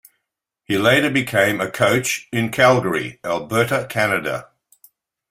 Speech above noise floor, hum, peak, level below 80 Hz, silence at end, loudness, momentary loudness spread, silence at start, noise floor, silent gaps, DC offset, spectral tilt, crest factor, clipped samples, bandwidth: 60 dB; none; 0 dBFS; -56 dBFS; 0.9 s; -18 LUFS; 9 LU; 0.7 s; -79 dBFS; none; under 0.1%; -4.5 dB/octave; 20 dB; under 0.1%; 16 kHz